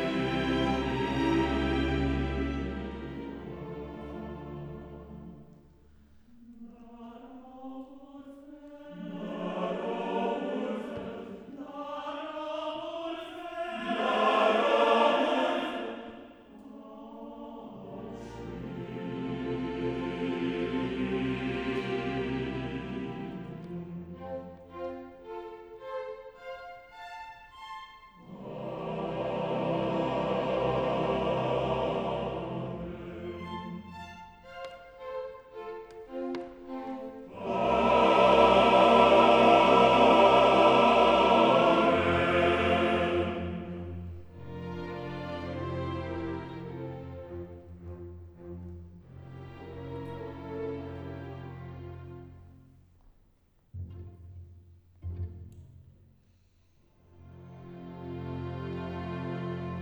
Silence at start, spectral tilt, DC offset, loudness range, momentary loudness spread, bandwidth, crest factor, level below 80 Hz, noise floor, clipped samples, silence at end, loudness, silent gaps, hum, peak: 0 s; -6.5 dB/octave; under 0.1%; 24 LU; 25 LU; 11 kHz; 22 dB; -50 dBFS; -66 dBFS; under 0.1%; 0 s; -28 LUFS; none; none; -8 dBFS